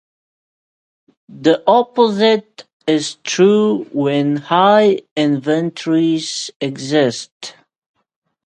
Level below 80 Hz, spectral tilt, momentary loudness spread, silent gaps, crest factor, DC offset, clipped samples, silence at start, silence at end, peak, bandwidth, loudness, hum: -66 dBFS; -5 dB/octave; 11 LU; 2.73-2.80 s, 5.11-5.16 s, 6.56-6.60 s, 7.32-7.40 s; 16 dB; under 0.1%; under 0.1%; 1.3 s; 0.95 s; 0 dBFS; 9.4 kHz; -15 LUFS; none